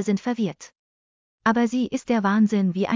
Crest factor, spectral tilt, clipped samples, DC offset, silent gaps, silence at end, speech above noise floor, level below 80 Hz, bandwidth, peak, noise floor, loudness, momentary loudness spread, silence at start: 16 dB; -6.5 dB/octave; under 0.1%; under 0.1%; 0.79-1.38 s; 0 s; over 68 dB; -62 dBFS; 7.6 kHz; -6 dBFS; under -90 dBFS; -23 LUFS; 8 LU; 0 s